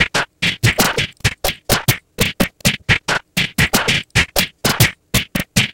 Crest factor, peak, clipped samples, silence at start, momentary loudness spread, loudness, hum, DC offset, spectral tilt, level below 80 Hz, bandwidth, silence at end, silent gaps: 18 dB; 0 dBFS; under 0.1%; 0 s; 5 LU; -16 LUFS; none; 0.3%; -3 dB/octave; -34 dBFS; 17.5 kHz; 0 s; none